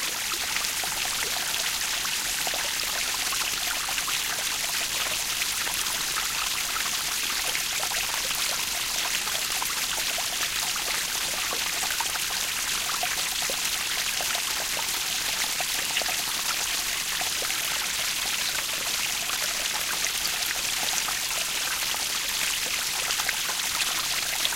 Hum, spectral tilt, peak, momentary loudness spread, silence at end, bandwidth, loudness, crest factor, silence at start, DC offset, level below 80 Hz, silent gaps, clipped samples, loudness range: none; 1.5 dB/octave; -8 dBFS; 1 LU; 0 s; 17 kHz; -25 LUFS; 20 dB; 0 s; under 0.1%; -54 dBFS; none; under 0.1%; 0 LU